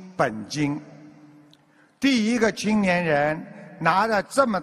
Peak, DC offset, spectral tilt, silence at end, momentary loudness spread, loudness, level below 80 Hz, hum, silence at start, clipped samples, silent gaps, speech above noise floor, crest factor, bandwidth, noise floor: -4 dBFS; under 0.1%; -5 dB/octave; 0 s; 7 LU; -23 LUFS; -58 dBFS; none; 0 s; under 0.1%; none; 35 dB; 20 dB; 13.5 kHz; -57 dBFS